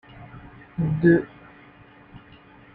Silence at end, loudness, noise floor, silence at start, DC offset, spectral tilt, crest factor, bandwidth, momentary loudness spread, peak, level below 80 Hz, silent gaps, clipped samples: 0.55 s; -21 LUFS; -50 dBFS; 0.2 s; under 0.1%; -11.5 dB/octave; 20 dB; 4.3 kHz; 25 LU; -6 dBFS; -52 dBFS; none; under 0.1%